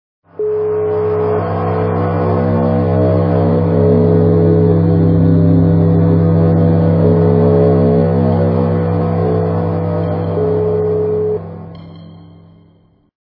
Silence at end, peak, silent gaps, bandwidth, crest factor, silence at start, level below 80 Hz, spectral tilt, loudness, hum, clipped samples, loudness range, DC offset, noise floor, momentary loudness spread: 1.1 s; 0 dBFS; none; 4.7 kHz; 12 dB; 0.4 s; -40 dBFS; -14 dB/octave; -13 LUFS; none; under 0.1%; 6 LU; under 0.1%; -50 dBFS; 6 LU